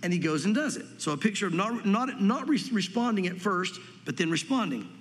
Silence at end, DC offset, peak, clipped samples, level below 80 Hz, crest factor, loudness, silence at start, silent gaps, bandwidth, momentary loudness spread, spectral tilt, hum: 0 s; under 0.1%; -12 dBFS; under 0.1%; -82 dBFS; 18 dB; -28 LUFS; 0 s; none; 13 kHz; 6 LU; -5 dB/octave; none